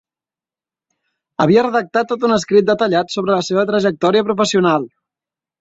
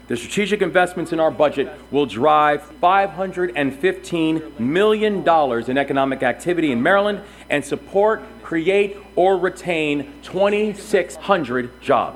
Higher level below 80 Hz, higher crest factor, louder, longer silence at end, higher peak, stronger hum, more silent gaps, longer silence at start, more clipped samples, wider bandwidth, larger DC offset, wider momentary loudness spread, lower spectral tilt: second, -58 dBFS vs -50 dBFS; about the same, 16 dB vs 18 dB; first, -16 LUFS vs -19 LUFS; first, 0.75 s vs 0 s; about the same, 0 dBFS vs 0 dBFS; neither; neither; first, 1.4 s vs 0.1 s; neither; second, 8 kHz vs 14 kHz; neither; about the same, 5 LU vs 7 LU; about the same, -5.5 dB/octave vs -5.5 dB/octave